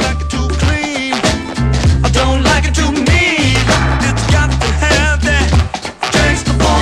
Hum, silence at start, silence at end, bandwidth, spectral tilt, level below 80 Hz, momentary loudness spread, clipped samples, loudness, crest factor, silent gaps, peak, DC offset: none; 0 s; 0 s; 12.5 kHz; -4.5 dB/octave; -18 dBFS; 5 LU; under 0.1%; -13 LUFS; 12 dB; none; 0 dBFS; under 0.1%